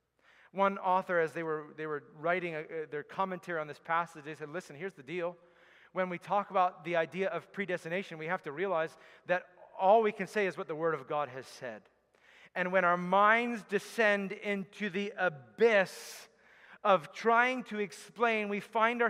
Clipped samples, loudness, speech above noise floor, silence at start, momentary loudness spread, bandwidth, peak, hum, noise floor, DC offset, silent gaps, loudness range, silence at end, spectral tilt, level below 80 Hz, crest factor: under 0.1%; -32 LUFS; 32 dB; 0.55 s; 15 LU; 15.5 kHz; -12 dBFS; none; -65 dBFS; under 0.1%; none; 6 LU; 0 s; -5 dB/octave; -86 dBFS; 22 dB